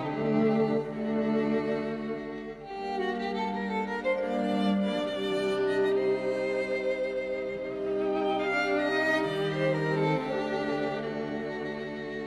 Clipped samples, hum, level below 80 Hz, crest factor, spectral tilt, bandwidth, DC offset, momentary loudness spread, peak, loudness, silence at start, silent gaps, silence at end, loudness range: under 0.1%; none; -60 dBFS; 14 dB; -6.5 dB/octave; 12 kHz; under 0.1%; 8 LU; -16 dBFS; -29 LUFS; 0 s; none; 0 s; 3 LU